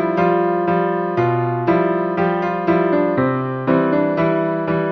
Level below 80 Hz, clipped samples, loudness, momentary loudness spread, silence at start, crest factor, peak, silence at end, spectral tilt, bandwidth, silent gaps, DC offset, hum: -52 dBFS; under 0.1%; -18 LUFS; 3 LU; 0 s; 14 dB; -2 dBFS; 0 s; -10 dB/octave; 5.8 kHz; none; under 0.1%; none